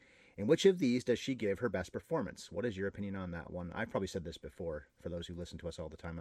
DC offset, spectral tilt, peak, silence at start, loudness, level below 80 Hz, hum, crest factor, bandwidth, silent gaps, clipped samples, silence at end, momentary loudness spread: under 0.1%; -5.5 dB/octave; -14 dBFS; 0.35 s; -37 LUFS; -62 dBFS; none; 22 dB; 13.5 kHz; none; under 0.1%; 0 s; 16 LU